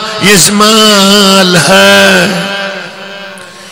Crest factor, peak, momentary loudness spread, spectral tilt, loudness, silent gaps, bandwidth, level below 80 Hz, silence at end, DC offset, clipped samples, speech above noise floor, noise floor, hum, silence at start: 6 dB; 0 dBFS; 20 LU; -3 dB/octave; -4 LUFS; none; over 20 kHz; -42 dBFS; 0 s; under 0.1%; 4%; 22 dB; -26 dBFS; none; 0 s